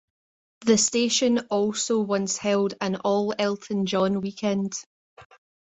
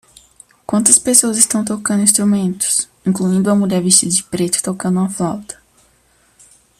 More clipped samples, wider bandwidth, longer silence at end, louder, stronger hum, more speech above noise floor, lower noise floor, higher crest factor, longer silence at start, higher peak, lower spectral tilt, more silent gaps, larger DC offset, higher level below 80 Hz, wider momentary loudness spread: neither; second, 8.4 kHz vs 15 kHz; second, 0.4 s vs 1.25 s; second, -24 LUFS vs -14 LUFS; neither; first, over 66 dB vs 40 dB; first, under -90 dBFS vs -55 dBFS; about the same, 18 dB vs 16 dB; about the same, 0.6 s vs 0.7 s; second, -8 dBFS vs 0 dBFS; about the same, -4 dB/octave vs -3.5 dB/octave; first, 4.86-5.17 s vs none; neither; second, -66 dBFS vs -54 dBFS; second, 7 LU vs 11 LU